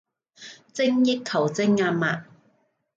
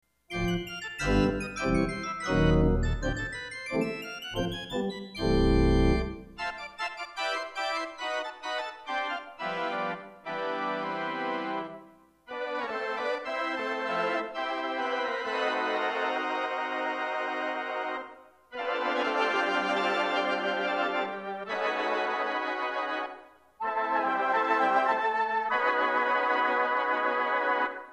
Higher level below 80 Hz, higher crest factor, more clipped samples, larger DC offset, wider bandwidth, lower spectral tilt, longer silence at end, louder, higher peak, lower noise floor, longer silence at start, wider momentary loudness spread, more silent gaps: second, -72 dBFS vs -40 dBFS; about the same, 14 dB vs 18 dB; neither; neither; second, 7.8 kHz vs 13.5 kHz; about the same, -5.5 dB/octave vs -5.5 dB/octave; first, 0.75 s vs 0 s; first, -23 LUFS vs -29 LUFS; about the same, -10 dBFS vs -12 dBFS; first, -67 dBFS vs -55 dBFS; about the same, 0.4 s vs 0.3 s; first, 22 LU vs 10 LU; neither